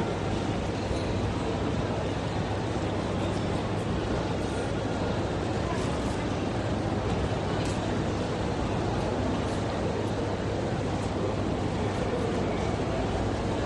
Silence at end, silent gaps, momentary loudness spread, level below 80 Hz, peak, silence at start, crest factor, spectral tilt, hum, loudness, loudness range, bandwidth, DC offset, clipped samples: 0 s; none; 1 LU; -40 dBFS; -16 dBFS; 0 s; 14 dB; -6.5 dB/octave; none; -30 LUFS; 1 LU; 11 kHz; under 0.1%; under 0.1%